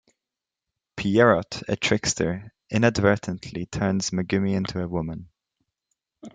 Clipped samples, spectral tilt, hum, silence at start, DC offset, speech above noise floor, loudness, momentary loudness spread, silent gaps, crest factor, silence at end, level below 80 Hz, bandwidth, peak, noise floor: under 0.1%; -5 dB/octave; none; 0.95 s; under 0.1%; 65 dB; -24 LUFS; 13 LU; none; 22 dB; 0.05 s; -52 dBFS; 9.4 kHz; -4 dBFS; -88 dBFS